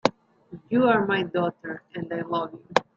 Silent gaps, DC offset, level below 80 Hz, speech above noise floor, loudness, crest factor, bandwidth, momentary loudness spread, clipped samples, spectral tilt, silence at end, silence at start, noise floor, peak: none; under 0.1%; -66 dBFS; 22 dB; -26 LUFS; 24 dB; 7.6 kHz; 14 LU; under 0.1%; -6 dB/octave; 0.15 s; 0.05 s; -46 dBFS; -2 dBFS